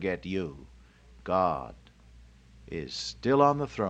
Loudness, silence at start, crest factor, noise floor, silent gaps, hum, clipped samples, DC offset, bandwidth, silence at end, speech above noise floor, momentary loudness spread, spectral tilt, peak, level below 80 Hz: -29 LUFS; 0 s; 22 dB; -55 dBFS; none; none; under 0.1%; under 0.1%; 8.8 kHz; 0 s; 26 dB; 20 LU; -6 dB/octave; -8 dBFS; -54 dBFS